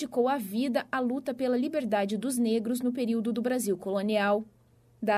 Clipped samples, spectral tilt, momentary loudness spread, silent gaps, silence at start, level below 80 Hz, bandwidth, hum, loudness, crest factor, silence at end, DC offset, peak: under 0.1%; -5 dB/octave; 3 LU; none; 0 s; -72 dBFS; 15.5 kHz; none; -29 LUFS; 14 dB; 0 s; under 0.1%; -14 dBFS